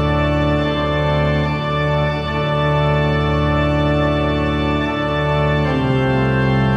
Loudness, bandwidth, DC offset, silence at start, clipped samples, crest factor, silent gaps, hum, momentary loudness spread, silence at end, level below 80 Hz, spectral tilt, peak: -17 LUFS; 7.4 kHz; under 0.1%; 0 s; under 0.1%; 12 dB; none; none; 3 LU; 0 s; -28 dBFS; -8 dB/octave; -4 dBFS